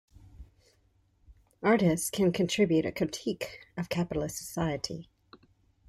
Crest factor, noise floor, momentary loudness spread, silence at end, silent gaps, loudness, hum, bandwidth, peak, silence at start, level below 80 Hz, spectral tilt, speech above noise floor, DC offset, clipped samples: 18 dB; -68 dBFS; 13 LU; 0.85 s; none; -30 LUFS; none; 15.5 kHz; -14 dBFS; 0.35 s; -56 dBFS; -5 dB/octave; 39 dB; under 0.1%; under 0.1%